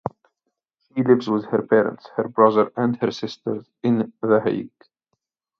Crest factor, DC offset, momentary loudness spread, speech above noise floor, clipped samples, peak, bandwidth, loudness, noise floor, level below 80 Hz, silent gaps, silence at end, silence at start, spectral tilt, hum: 20 dB; under 0.1%; 12 LU; 58 dB; under 0.1%; -2 dBFS; 6.8 kHz; -21 LUFS; -79 dBFS; -66 dBFS; none; 0.9 s; 0.05 s; -7.5 dB/octave; none